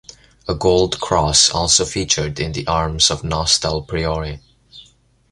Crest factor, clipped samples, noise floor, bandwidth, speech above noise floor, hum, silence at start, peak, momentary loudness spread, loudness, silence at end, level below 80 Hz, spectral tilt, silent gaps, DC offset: 20 dB; under 0.1%; -52 dBFS; 11.5 kHz; 34 dB; none; 0.45 s; 0 dBFS; 12 LU; -16 LUFS; 0.5 s; -34 dBFS; -3 dB/octave; none; under 0.1%